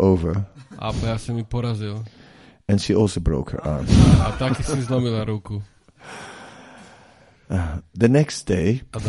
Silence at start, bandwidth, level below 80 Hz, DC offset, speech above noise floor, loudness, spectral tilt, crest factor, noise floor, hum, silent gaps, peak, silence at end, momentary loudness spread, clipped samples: 0 s; 11.5 kHz; -32 dBFS; under 0.1%; 31 dB; -21 LUFS; -7 dB/octave; 20 dB; -51 dBFS; none; none; 0 dBFS; 0 s; 20 LU; under 0.1%